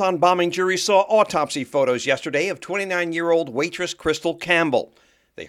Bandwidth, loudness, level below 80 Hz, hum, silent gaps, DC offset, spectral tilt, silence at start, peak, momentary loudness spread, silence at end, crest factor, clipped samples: 15 kHz; -21 LUFS; -58 dBFS; none; none; under 0.1%; -3.5 dB/octave; 0 s; -2 dBFS; 7 LU; 0 s; 18 dB; under 0.1%